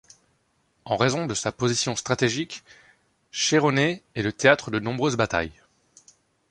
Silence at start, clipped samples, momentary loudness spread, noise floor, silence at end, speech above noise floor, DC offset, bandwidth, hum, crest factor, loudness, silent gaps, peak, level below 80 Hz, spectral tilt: 0.85 s; under 0.1%; 10 LU; -68 dBFS; 1 s; 45 dB; under 0.1%; 11.5 kHz; none; 24 dB; -24 LUFS; none; -2 dBFS; -54 dBFS; -4 dB/octave